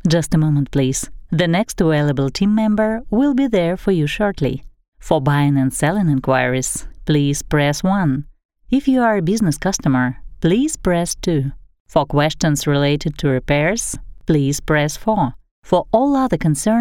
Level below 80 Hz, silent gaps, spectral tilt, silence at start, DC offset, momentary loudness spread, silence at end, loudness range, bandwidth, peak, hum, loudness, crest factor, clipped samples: -36 dBFS; 4.88-4.92 s, 8.45-8.49 s, 11.80-11.85 s, 15.51-15.62 s; -5.5 dB/octave; 0.05 s; under 0.1%; 5 LU; 0 s; 1 LU; 16.5 kHz; -2 dBFS; none; -18 LUFS; 16 dB; under 0.1%